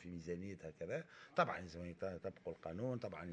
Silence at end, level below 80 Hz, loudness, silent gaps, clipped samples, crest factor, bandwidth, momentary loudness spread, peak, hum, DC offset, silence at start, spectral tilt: 0 s; -70 dBFS; -45 LUFS; none; under 0.1%; 24 dB; 9.6 kHz; 11 LU; -20 dBFS; none; under 0.1%; 0 s; -6.5 dB/octave